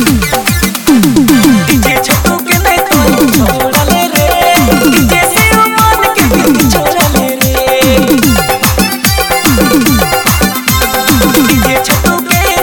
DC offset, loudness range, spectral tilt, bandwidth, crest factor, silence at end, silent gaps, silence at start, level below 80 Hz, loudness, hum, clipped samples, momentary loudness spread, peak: under 0.1%; 1 LU; -4 dB/octave; over 20 kHz; 8 dB; 0 s; none; 0 s; -20 dBFS; -8 LUFS; none; 0.5%; 3 LU; 0 dBFS